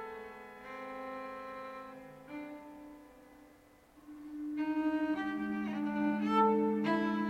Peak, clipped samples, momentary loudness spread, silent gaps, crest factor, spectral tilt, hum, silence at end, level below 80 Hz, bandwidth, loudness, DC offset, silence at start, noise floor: -18 dBFS; under 0.1%; 22 LU; none; 18 dB; -7 dB/octave; none; 0 s; -70 dBFS; 9.8 kHz; -35 LUFS; under 0.1%; 0 s; -62 dBFS